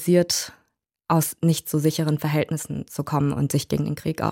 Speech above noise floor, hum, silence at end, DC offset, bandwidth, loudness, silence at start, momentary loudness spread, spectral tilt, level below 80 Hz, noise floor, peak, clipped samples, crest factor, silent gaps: 47 dB; none; 0 s; under 0.1%; 17 kHz; -23 LUFS; 0 s; 9 LU; -5.5 dB/octave; -54 dBFS; -70 dBFS; -8 dBFS; under 0.1%; 16 dB; none